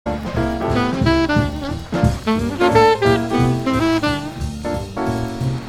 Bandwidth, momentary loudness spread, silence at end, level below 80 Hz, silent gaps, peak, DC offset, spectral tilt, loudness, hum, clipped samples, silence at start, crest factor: 15.5 kHz; 11 LU; 0 s; -32 dBFS; none; -2 dBFS; under 0.1%; -6.5 dB/octave; -18 LUFS; none; under 0.1%; 0.05 s; 16 dB